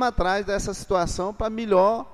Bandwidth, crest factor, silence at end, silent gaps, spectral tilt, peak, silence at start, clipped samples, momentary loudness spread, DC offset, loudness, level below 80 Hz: 13.5 kHz; 16 dB; 0 s; none; -5 dB/octave; -8 dBFS; 0 s; under 0.1%; 8 LU; under 0.1%; -24 LUFS; -36 dBFS